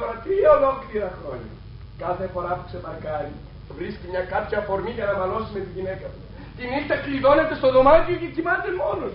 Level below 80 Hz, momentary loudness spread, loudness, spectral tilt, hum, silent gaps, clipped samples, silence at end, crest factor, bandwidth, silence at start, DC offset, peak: -40 dBFS; 19 LU; -22 LUFS; -4.5 dB/octave; none; none; under 0.1%; 0 s; 20 dB; 5.6 kHz; 0 s; under 0.1%; -2 dBFS